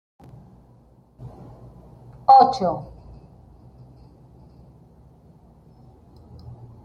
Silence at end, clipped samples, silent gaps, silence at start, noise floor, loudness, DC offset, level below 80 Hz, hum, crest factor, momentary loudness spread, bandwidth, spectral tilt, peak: 4 s; under 0.1%; none; 1.2 s; -53 dBFS; -17 LUFS; under 0.1%; -54 dBFS; none; 22 dB; 31 LU; 7.2 kHz; -6.5 dB/octave; -2 dBFS